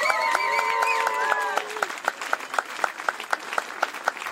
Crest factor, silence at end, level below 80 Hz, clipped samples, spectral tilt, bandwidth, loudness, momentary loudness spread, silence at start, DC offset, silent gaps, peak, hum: 22 dB; 0 s; -82 dBFS; under 0.1%; 0 dB/octave; 16 kHz; -25 LUFS; 7 LU; 0 s; under 0.1%; none; -4 dBFS; none